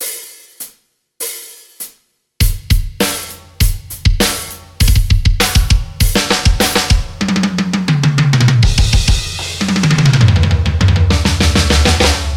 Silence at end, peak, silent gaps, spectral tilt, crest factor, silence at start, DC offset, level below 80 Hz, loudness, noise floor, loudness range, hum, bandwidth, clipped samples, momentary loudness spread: 0 s; 0 dBFS; none; -4.5 dB/octave; 12 dB; 0 s; under 0.1%; -18 dBFS; -13 LUFS; -54 dBFS; 7 LU; none; 18 kHz; under 0.1%; 17 LU